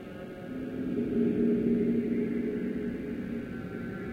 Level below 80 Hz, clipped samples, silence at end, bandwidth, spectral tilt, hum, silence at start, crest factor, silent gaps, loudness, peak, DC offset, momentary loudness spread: -54 dBFS; under 0.1%; 0 s; 5 kHz; -9 dB/octave; none; 0 s; 14 dB; none; -31 LUFS; -16 dBFS; under 0.1%; 11 LU